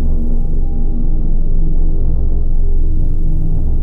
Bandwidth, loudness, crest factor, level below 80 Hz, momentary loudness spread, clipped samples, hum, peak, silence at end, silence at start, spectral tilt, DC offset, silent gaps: 0.9 kHz; -20 LUFS; 6 dB; -10 dBFS; 2 LU; under 0.1%; none; -4 dBFS; 0 s; 0 s; -12 dB/octave; under 0.1%; none